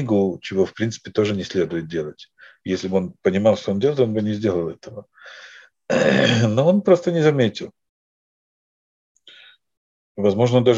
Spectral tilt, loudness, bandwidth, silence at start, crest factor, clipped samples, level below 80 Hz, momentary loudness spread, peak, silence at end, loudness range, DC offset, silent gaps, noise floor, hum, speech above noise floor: -6.5 dB/octave; -20 LUFS; 8 kHz; 0 s; 20 dB; under 0.1%; -60 dBFS; 20 LU; -2 dBFS; 0 s; 5 LU; under 0.1%; 7.89-9.15 s, 9.77-10.15 s; -49 dBFS; none; 29 dB